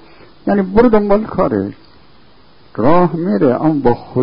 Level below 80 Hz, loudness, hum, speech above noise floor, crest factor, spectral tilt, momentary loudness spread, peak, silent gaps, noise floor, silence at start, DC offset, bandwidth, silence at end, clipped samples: -38 dBFS; -14 LUFS; none; 35 dB; 14 dB; -11.5 dB/octave; 9 LU; 0 dBFS; none; -47 dBFS; 0 s; under 0.1%; 5.4 kHz; 0 s; under 0.1%